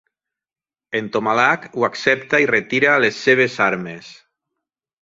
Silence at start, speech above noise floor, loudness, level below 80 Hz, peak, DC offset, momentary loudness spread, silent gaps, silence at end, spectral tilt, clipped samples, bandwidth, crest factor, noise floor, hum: 0.9 s; over 72 dB; -17 LUFS; -64 dBFS; -2 dBFS; under 0.1%; 11 LU; none; 0.9 s; -4.5 dB/octave; under 0.1%; 7.8 kHz; 18 dB; under -90 dBFS; none